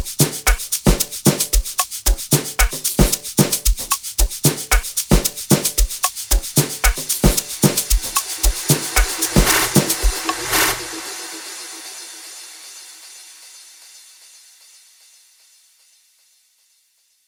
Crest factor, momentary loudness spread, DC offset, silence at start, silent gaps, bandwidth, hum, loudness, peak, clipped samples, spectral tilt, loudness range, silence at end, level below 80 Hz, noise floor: 20 dB; 17 LU; under 0.1%; 0 s; none; over 20 kHz; none; -18 LUFS; 0 dBFS; under 0.1%; -3 dB/octave; 16 LU; 3.3 s; -24 dBFS; -61 dBFS